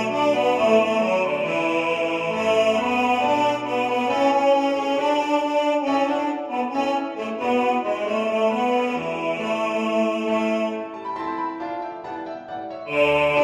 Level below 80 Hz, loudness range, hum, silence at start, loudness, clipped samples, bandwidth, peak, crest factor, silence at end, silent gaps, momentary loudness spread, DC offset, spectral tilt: -62 dBFS; 5 LU; none; 0 s; -22 LUFS; under 0.1%; 12.5 kHz; -6 dBFS; 16 dB; 0 s; none; 11 LU; under 0.1%; -5 dB/octave